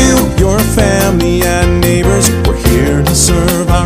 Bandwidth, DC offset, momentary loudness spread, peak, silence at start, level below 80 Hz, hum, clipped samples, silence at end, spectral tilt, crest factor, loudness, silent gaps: 16 kHz; under 0.1%; 2 LU; 0 dBFS; 0 s; -16 dBFS; none; 0.2%; 0 s; -5 dB/octave; 10 dB; -10 LUFS; none